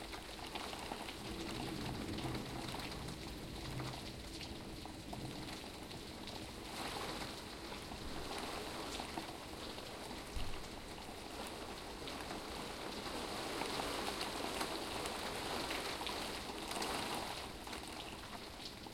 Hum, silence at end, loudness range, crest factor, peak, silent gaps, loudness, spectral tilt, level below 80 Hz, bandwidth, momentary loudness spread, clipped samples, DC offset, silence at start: none; 0 s; 6 LU; 22 dB; -24 dBFS; none; -44 LUFS; -3.5 dB/octave; -56 dBFS; 16.5 kHz; 7 LU; under 0.1%; under 0.1%; 0 s